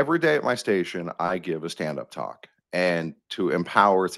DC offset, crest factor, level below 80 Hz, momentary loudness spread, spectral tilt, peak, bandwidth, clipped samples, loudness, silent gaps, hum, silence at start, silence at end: under 0.1%; 24 dB; -68 dBFS; 13 LU; -5.5 dB/octave; -2 dBFS; 12.5 kHz; under 0.1%; -25 LUFS; none; none; 0 s; 0 s